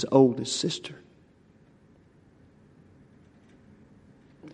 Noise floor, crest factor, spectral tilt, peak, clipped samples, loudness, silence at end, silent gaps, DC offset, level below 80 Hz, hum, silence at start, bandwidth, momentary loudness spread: -59 dBFS; 26 dB; -5.5 dB/octave; -6 dBFS; under 0.1%; -25 LUFS; 0.05 s; none; under 0.1%; -70 dBFS; none; 0 s; 10 kHz; 29 LU